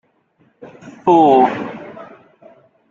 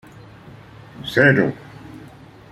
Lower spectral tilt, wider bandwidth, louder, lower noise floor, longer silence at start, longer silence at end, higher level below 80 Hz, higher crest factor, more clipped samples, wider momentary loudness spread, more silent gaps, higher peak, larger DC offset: about the same, -7.5 dB/octave vs -7 dB/octave; second, 7.2 kHz vs 14 kHz; first, -13 LUFS vs -17 LUFS; first, -58 dBFS vs -43 dBFS; second, 0.6 s vs 1 s; first, 0.85 s vs 0.55 s; second, -62 dBFS vs -54 dBFS; about the same, 16 dB vs 20 dB; neither; about the same, 25 LU vs 25 LU; neither; about the same, -2 dBFS vs -2 dBFS; neither